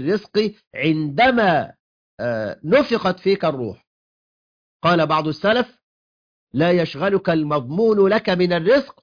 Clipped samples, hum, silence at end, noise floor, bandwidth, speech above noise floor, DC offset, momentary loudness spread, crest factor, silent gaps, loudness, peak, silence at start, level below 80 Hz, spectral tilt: under 0.1%; none; 0.1 s; under -90 dBFS; 5.2 kHz; over 72 dB; under 0.1%; 9 LU; 16 dB; 0.67-0.71 s, 1.79-2.18 s, 3.87-4.80 s, 5.83-6.47 s; -19 LUFS; -4 dBFS; 0 s; -56 dBFS; -7.5 dB/octave